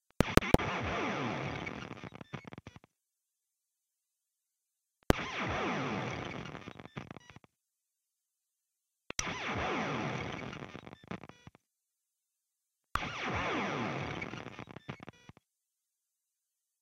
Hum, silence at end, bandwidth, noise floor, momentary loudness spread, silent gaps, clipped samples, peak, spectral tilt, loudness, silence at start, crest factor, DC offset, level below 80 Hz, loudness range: none; 1.7 s; 15 kHz; -87 dBFS; 17 LU; none; under 0.1%; 0 dBFS; -5 dB/octave; -35 LUFS; 0.2 s; 38 dB; under 0.1%; -50 dBFS; 7 LU